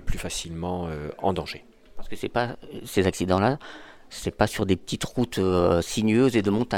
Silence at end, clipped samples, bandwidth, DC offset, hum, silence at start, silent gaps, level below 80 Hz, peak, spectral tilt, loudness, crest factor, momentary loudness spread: 0 s; under 0.1%; 17 kHz; under 0.1%; none; 0 s; none; -40 dBFS; -4 dBFS; -5.5 dB/octave; -25 LUFS; 22 dB; 15 LU